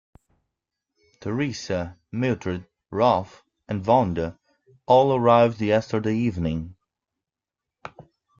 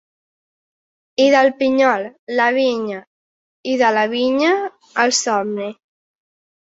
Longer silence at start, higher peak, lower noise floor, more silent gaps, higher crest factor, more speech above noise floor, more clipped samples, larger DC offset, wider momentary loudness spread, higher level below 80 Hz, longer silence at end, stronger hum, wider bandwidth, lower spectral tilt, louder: about the same, 1.2 s vs 1.2 s; about the same, -4 dBFS vs -2 dBFS; about the same, -88 dBFS vs under -90 dBFS; second, none vs 2.19-2.27 s, 3.07-3.64 s; about the same, 20 dB vs 18 dB; second, 66 dB vs over 74 dB; neither; neither; first, 20 LU vs 13 LU; first, -54 dBFS vs -68 dBFS; second, 0.5 s vs 0.95 s; neither; about the same, 7.4 kHz vs 8 kHz; first, -7 dB/octave vs -2.5 dB/octave; second, -23 LUFS vs -17 LUFS